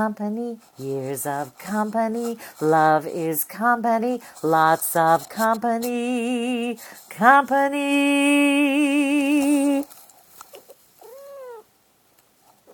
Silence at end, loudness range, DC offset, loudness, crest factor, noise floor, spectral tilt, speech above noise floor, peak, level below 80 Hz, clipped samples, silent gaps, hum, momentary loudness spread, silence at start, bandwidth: 1.15 s; 5 LU; under 0.1%; -21 LUFS; 22 dB; -61 dBFS; -4.5 dB/octave; 40 dB; 0 dBFS; -72 dBFS; under 0.1%; none; none; 14 LU; 0 s; 19.5 kHz